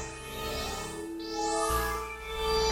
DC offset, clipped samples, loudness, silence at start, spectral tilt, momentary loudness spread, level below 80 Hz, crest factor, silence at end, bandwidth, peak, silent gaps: under 0.1%; under 0.1%; -32 LUFS; 0 s; -3 dB/octave; 9 LU; -42 dBFS; 16 dB; 0 s; 16 kHz; -16 dBFS; none